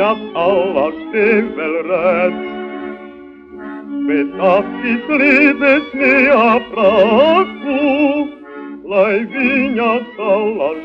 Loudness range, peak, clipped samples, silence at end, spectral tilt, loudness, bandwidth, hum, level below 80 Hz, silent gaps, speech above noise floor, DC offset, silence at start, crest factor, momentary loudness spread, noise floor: 7 LU; 0 dBFS; under 0.1%; 0 s; -7 dB/octave; -14 LUFS; 6 kHz; none; -52 dBFS; none; 22 dB; under 0.1%; 0 s; 14 dB; 16 LU; -35 dBFS